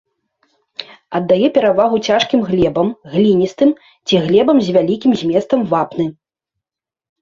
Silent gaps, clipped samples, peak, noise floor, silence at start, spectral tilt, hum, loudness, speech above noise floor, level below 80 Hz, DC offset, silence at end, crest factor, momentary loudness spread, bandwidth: none; under 0.1%; -2 dBFS; -86 dBFS; 0.8 s; -6.5 dB/octave; none; -15 LUFS; 72 dB; -48 dBFS; under 0.1%; 1.1 s; 14 dB; 11 LU; 7.6 kHz